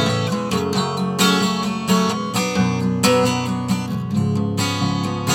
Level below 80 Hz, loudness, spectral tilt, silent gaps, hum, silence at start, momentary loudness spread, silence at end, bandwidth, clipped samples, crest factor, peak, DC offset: -50 dBFS; -19 LUFS; -5 dB/octave; none; none; 0 s; 6 LU; 0 s; 17.5 kHz; under 0.1%; 16 dB; -2 dBFS; under 0.1%